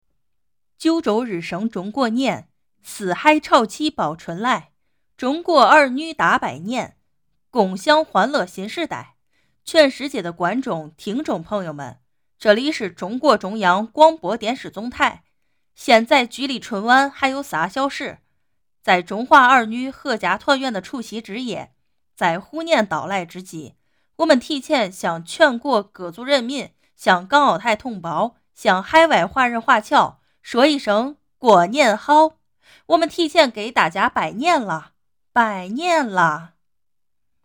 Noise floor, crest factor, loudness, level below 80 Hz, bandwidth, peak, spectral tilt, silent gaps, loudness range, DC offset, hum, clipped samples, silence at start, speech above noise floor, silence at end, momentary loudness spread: -84 dBFS; 18 dB; -18 LUFS; -60 dBFS; over 20 kHz; -2 dBFS; -4 dB/octave; none; 5 LU; under 0.1%; none; under 0.1%; 0.8 s; 66 dB; 1 s; 14 LU